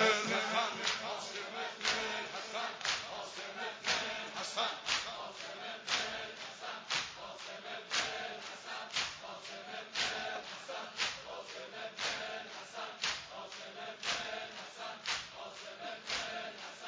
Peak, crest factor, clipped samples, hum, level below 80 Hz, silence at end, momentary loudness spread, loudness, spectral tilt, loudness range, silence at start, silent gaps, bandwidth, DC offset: -14 dBFS; 26 dB; under 0.1%; none; -74 dBFS; 0 s; 11 LU; -38 LUFS; -1 dB/octave; 4 LU; 0 s; none; 8 kHz; under 0.1%